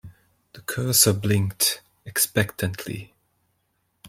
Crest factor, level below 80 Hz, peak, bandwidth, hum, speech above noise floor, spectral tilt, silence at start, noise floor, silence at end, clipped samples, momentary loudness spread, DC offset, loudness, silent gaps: 24 dB; -58 dBFS; -2 dBFS; 16.5 kHz; none; 49 dB; -3 dB/octave; 0.05 s; -72 dBFS; 0 s; under 0.1%; 17 LU; under 0.1%; -22 LUFS; none